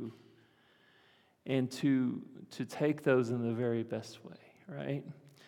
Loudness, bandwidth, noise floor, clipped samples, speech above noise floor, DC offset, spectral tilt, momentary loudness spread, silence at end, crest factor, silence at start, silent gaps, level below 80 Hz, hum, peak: -34 LUFS; 15.5 kHz; -67 dBFS; under 0.1%; 33 dB; under 0.1%; -7 dB/octave; 20 LU; 0.2 s; 20 dB; 0 s; none; -86 dBFS; none; -16 dBFS